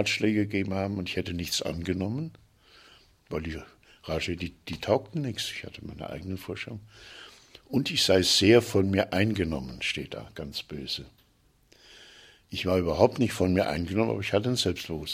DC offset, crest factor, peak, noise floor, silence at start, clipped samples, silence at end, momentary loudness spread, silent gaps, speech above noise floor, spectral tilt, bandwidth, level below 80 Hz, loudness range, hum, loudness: under 0.1%; 24 dB; -4 dBFS; -64 dBFS; 0 s; under 0.1%; 0 s; 17 LU; none; 37 dB; -4.5 dB/octave; 16 kHz; -52 dBFS; 9 LU; none; -28 LUFS